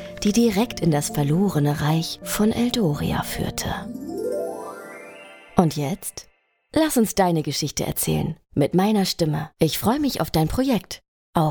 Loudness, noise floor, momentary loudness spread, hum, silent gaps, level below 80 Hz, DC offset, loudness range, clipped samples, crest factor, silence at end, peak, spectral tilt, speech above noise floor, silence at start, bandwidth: -22 LUFS; -43 dBFS; 12 LU; none; 11.08-11.33 s; -44 dBFS; under 0.1%; 5 LU; under 0.1%; 22 dB; 0 s; 0 dBFS; -5.5 dB/octave; 22 dB; 0 s; over 20 kHz